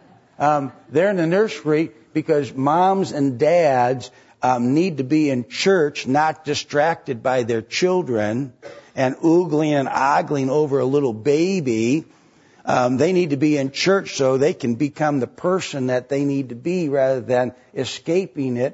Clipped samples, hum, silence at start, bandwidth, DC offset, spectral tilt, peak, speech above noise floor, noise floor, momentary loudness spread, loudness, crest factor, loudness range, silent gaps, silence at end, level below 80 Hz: under 0.1%; none; 0.4 s; 8 kHz; under 0.1%; -6 dB/octave; -6 dBFS; 31 dB; -50 dBFS; 7 LU; -20 LUFS; 14 dB; 3 LU; none; 0 s; -64 dBFS